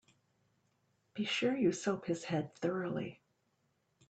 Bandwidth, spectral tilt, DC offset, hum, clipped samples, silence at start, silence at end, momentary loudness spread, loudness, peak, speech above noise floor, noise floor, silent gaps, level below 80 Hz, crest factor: 9 kHz; -5 dB/octave; under 0.1%; none; under 0.1%; 1.15 s; 0.95 s; 9 LU; -36 LUFS; -20 dBFS; 43 dB; -78 dBFS; none; -76 dBFS; 18 dB